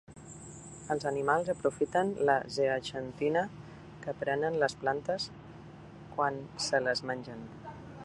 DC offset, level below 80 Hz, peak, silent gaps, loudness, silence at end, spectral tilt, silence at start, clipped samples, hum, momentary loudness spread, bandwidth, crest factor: under 0.1%; -62 dBFS; -12 dBFS; none; -32 LUFS; 0 s; -4.5 dB/octave; 0.1 s; under 0.1%; none; 19 LU; 11.5 kHz; 20 dB